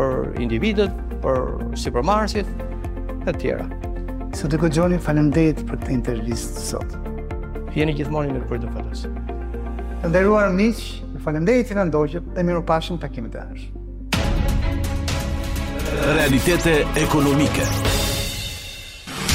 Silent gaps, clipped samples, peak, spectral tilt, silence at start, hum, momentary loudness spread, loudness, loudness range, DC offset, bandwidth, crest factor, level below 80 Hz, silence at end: none; under 0.1%; -6 dBFS; -5.5 dB/octave; 0 s; none; 13 LU; -22 LUFS; 6 LU; under 0.1%; 16 kHz; 16 dB; -28 dBFS; 0 s